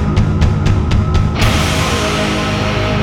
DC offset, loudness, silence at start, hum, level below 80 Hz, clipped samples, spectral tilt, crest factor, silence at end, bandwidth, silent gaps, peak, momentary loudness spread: under 0.1%; -14 LUFS; 0 s; none; -20 dBFS; under 0.1%; -5.5 dB/octave; 12 dB; 0 s; 16.5 kHz; none; 0 dBFS; 2 LU